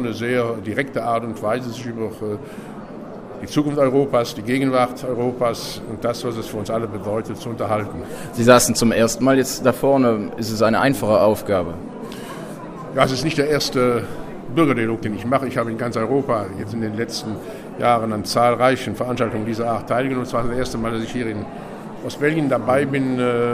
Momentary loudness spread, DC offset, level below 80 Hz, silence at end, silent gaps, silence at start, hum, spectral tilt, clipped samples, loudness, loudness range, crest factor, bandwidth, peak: 15 LU; under 0.1%; -46 dBFS; 0 s; none; 0 s; none; -5 dB/octave; under 0.1%; -20 LUFS; 6 LU; 20 dB; 15.5 kHz; 0 dBFS